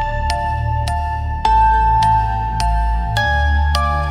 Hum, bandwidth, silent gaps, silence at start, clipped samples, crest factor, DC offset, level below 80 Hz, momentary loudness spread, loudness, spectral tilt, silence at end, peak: none; 12.5 kHz; none; 0 s; under 0.1%; 14 dB; under 0.1%; -20 dBFS; 7 LU; -17 LUFS; -5 dB/octave; 0 s; -2 dBFS